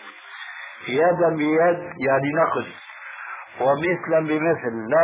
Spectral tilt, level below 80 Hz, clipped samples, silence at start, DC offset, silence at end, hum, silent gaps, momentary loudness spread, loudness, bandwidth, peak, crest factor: -10 dB/octave; -64 dBFS; under 0.1%; 0 s; under 0.1%; 0 s; none; none; 16 LU; -21 LUFS; 4 kHz; -8 dBFS; 14 dB